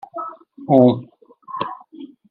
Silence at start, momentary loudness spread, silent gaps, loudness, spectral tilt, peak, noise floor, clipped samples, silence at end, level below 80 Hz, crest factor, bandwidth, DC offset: 0.15 s; 24 LU; none; -18 LUFS; -10.5 dB/octave; 0 dBFS; -40 dBFS; under 0.1%; 0.25 s; -64 dBFS; 20 dB; 4.5 kHz; under 0.1%